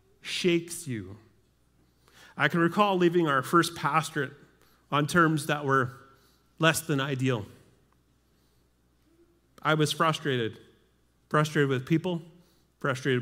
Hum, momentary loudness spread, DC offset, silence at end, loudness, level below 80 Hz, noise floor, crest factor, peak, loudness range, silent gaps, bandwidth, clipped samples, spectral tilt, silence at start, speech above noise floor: none; 12 LU; under 0.1%; 0 s; -27 LUFS; -68 dBFS; -67 dBFS; 22 dB; -6 dBFS; 6 LU; none; 16 kHz; under 0.1%; -5 dB/octave; 0.25 s; 40 dB